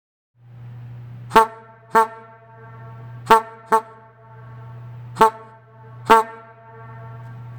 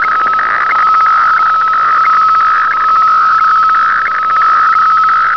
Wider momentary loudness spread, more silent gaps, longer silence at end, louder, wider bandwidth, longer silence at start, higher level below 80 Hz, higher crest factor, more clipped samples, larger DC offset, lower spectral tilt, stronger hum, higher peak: first, 25 LU vs 3 LU; neither; about the same, 0 s vs 0 s; second, -18 LUFS vs -8 LUFS; first, over 20 kHz vs 5.4 kHz; first, 0.65 s vs 0 s; second, -54 dBFS vs -48 dBFS; first, 22 dB vs 6 dB; neither; second, under 0.1% vs 0.5%; first, -4.5 dB/octave vs -2 dB/octave; neither; first, 0 dBFS vs -4 dBFS